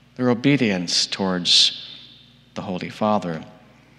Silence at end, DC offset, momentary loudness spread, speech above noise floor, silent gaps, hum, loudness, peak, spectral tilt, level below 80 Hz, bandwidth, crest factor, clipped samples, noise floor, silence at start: 0.45 s; under 0.1%; 20 LU; 29 dB; none; 60 Hz at -55 dBFS; -19 LUFS; -2 dBFS; -3.5 dB/octave; -66 dBFS; 12.5 kHz; 20 dB; under 0.1%; -50 dBFS; 0.2 s